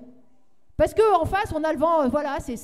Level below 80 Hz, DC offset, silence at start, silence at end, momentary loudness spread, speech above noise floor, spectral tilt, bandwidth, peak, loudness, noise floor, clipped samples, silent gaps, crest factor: -42 dBFS; 0.3%; 0 s; 0 s; 8 LU; 43 dB; -6 dB/octave; 15 kHz; -8 dBFS; -22 LUFS; -65 dBFS; under 0.1%; none; 16 dB